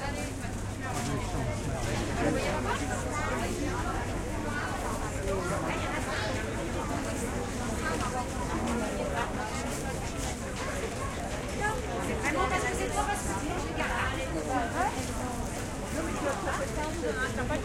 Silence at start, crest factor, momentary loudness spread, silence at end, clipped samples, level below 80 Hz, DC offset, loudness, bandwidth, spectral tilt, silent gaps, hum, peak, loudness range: 0 s; 18 dB; 5 LU; 0 s; under 0.1%; -40 dBFS; under 0.1%; -32 LUFS; 16.5 kHz; -4.5 dB/octave; none; none; -14 dBFS; 2 LU